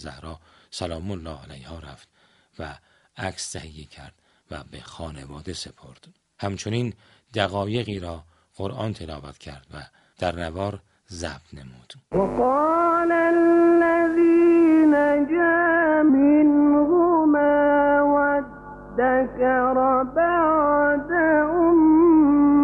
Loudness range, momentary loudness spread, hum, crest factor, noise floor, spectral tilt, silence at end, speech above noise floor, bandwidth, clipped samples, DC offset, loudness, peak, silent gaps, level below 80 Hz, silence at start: 19 LU; 22 LU; none; 16 dB; -39 dBFS; -6.5 dB/octave; 0 s; 15 dB; 11 kHz; under 0.1%; under 0.1%; -19 LUFS; -4 dBFS; none; -48 dBFS; 0 s